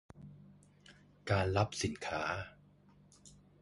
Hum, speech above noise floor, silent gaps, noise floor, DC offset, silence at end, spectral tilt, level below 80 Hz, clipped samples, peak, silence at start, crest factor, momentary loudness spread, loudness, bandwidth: none; 29 dB; none; -64 dBFS; under 0.1%; 0.3 s; -5 dB/octave; -56 dBFS; under 0.1%; -16 dBFS; 0.15 s; 24 dB; 23 LU; -36 LUFS; 11.5 kHz